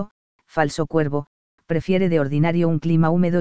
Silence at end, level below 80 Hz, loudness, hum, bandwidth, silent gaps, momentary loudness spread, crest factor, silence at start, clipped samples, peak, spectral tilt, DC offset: 0 s; -50 dBFS; -21 LUFS; none; 8 kHz; 0.11-0.39 s, 1.27-1.58 s; 9 LU; 16 dB; 0 s; under 0.1%; -4 dBFS; -8 dB/octave; 2%